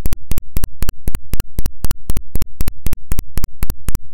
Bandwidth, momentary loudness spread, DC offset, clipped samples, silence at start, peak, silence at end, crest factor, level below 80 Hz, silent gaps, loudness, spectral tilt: 17.5 kHz; 3 LU; 0.3%; under 0.1%; 0 s; -2 dBFS; 0 s; 8 dB; -20 dBFS; none; -26 LUFS; -5 dB/octave